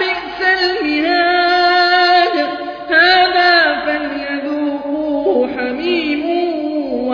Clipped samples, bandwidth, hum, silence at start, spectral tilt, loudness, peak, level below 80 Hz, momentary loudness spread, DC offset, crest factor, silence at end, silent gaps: under 0.1%; 5.4 kHz; none; 0 s; -4 dB/octave; -14 LUFS; 0 dBFS; -50 dBFS; 10 LU; under 0.1%; 14 dB; 0 s; none